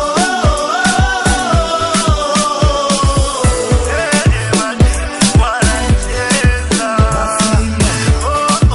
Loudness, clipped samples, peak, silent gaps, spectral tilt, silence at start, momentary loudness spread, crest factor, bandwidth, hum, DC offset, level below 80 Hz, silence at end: -13 LUFS; under 0.1%; 0 dBFS; none; -4.5 dB/octave; 0 s; 2 LU; 12 dB; 12 kHz; none; under 0.1%; -18 dBFS; 0 s